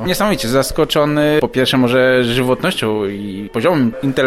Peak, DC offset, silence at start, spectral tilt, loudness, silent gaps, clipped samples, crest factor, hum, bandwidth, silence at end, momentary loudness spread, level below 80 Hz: -2 dBFS; under 0.1%; 0 s; -5 dB/octave; -15 LUFS; none; under 0.1%; 12 dB; none; 16.5 kHz; 0 s; 7 LU; -38 dBFS